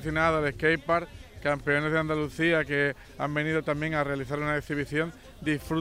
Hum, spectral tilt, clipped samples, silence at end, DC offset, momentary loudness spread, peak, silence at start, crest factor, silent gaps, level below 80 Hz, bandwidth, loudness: none; -6.5 dB/octave; under 0.1%; 0 s; under 0.1%; 6 LU; -10 dBFS; 0 s; 18 dB; none; -48 dBFS; 16 kHz; -28 LUFS